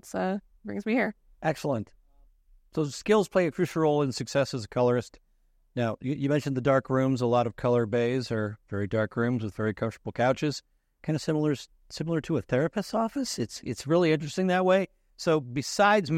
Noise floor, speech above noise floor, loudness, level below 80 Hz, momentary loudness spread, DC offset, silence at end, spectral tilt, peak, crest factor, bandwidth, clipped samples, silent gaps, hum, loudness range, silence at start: -66 dBFS; 39 dB; -28 LUFS; -60 dBFS; 10 LU; under 0.1%; 0 s; -6 dB/octave; -10 dBFS; 18 dB; 16 kHz; under 0.1%; none; none; 3 LU; 0.05 s